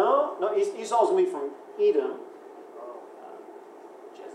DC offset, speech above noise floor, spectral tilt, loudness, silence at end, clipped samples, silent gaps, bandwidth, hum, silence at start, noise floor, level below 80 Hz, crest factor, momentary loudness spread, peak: under 0.1%; 21 dB; -4.5 dB/octave; -26 LUFS; 0 s; under 0.1%; none; 11.5 kHz; none; 0 s; -46 dBFS; under -90 dBFS; 18 dB; 23 LU; -10 dBFS